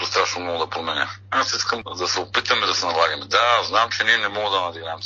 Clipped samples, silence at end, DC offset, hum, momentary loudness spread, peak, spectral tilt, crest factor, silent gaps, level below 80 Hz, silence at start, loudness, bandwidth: under 0.1%; 0 s; under 0.1%; none; 7 LU; -4 dBFS; -1.5 dB/octave; 18 dB; none; -62 dBFS; 0 s; -20 LUFS; 7.6 kHz